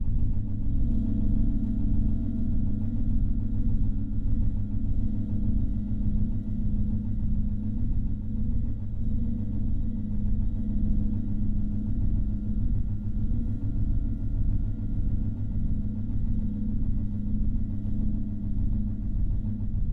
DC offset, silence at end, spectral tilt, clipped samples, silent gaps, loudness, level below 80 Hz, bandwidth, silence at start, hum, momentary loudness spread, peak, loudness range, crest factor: under 0.1%; 0 s; -12 dB/octave; under 0.1%; none; -31 LUFS; -28 dBFS; 1.5 kHz; 0 s; none; 3 LU; -14 dBFS; 2 LU; 10 dB